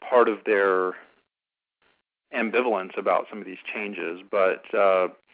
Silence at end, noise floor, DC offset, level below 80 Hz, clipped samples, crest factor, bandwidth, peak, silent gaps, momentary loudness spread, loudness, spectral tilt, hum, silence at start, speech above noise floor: 0.2 s; under -90 dBFS; under 0.1%; -76 dBFS; under 0.1%; 18 dB; 4 kHz; -6 dBFS; none; 12 LU; -24 LUFS; -8.5 dB/octave; none; 0 s; over 66 dB